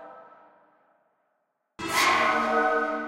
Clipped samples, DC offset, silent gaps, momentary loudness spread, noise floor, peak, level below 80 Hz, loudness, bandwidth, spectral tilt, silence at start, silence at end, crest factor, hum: under 0.1%; under 0.1%; none; 7 LU; -76 dBFS; -10 dBFS; -64 dBFS; -23 LUFS; 16 kHz; -2 dB/octave; 0 s; 0 s; 18 dB; none